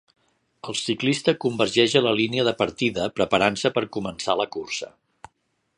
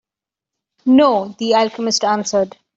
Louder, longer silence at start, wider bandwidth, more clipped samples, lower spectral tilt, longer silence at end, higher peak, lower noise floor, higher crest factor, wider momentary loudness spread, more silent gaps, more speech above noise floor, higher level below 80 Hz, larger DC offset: second, -23 LUFS vs -16 LUFS; second, 0.65 s vs 0.85 s; first, 11 kHz vs 7.8 kHz; neither; about the same, -4 dB/octave vs -3.5 dB/octave; first, 0.9 s vs 0.3 s; about the same, -2 dBFS vs -2 dBFS; second, -71 dBFS vs -88 dBFS; first, 22 dB vs 14 dB; first, 11 LU vs 8 LU; neither; second, 48 dB vs 73 dB; about the same, -58 dBFS vs -62 dBFS; neither